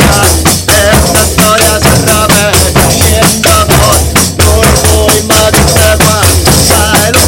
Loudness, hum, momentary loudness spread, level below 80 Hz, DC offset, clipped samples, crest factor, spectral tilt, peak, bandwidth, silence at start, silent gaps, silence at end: -5 LUFS; none; 1 LU; -18 dBFS; under 0.1%; 2%; 6 dB; -3.5 dB/octave; 0 dBFS; over 20 kHz; 0 s; none; 0 s